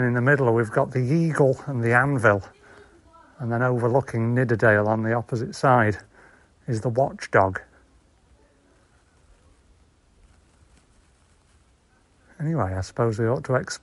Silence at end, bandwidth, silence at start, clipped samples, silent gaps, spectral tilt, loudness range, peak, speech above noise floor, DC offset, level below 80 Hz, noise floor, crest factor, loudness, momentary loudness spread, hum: 0.05 s; 11.5 kHz; 0 s; under 0.1%; none; -7.5 dB/octave; 9 LU; -2 dBFS; 39 dB; under 0.1%; -56 dBFS; -60 dBFS; 22 dB; -22 LUFS; 9 LU; none